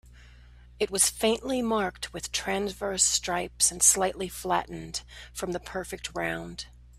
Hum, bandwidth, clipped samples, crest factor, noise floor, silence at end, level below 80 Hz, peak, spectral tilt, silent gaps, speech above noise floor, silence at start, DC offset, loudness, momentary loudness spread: none; 15.5 kHz; under 0.1%; 24 dB; -51 dBFS; 0 s; -50 dBFS; -6 dBFS; -2 dB/octave; none; 23 dB; 0.1 s; under 0.1%; -27 LUFS; 16 LU